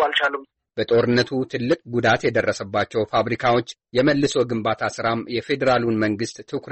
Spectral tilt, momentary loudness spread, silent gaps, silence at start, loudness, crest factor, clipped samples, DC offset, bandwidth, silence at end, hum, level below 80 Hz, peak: -5.5 dB/octave; 7 LU; none; 0 s; -21 LUFS; 14 dB; under 0.1%; under 0.1%; 8.6 kHz; 0 s; none; -54 dBFS; -8 dBFS